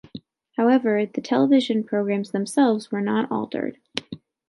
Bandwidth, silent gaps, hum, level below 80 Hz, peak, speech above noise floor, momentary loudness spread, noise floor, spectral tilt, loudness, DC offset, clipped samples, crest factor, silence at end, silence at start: 11.5 kHz; none; none; -70 dBFS; -2 dBFS; 22 dB; 15 LU; -43 dBFS; -6 dB/octave; -22 LUFS; under 0.1%; under 0.1%; 20 dB; 0.35 s; 0.15 s